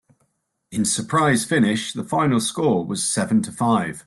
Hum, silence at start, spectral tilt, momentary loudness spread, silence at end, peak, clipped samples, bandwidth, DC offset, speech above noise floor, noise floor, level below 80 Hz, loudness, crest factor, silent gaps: none; 0.7 s; -4.5 dB/octave; 5 LU; 0.05 s; -6 dBFS; under 0.1%; 12.5 kHz; under 0.1%; 50 dB; -70 dBFS; -58 dBFS; -21 LUFS; 16 dB; none